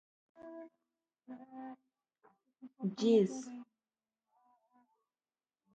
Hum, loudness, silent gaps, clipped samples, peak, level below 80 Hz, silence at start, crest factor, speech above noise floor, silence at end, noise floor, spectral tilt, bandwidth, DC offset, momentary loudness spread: none; -33 LUFS; none; under 0.1%; -18 dBFS; -86 dBFS; 0.4 s; 22 dB; over 55 dB; 2.1 s; under -90 dBFS; -6.5 dB/octave; 9 kHz; under 0.1%; 25 LU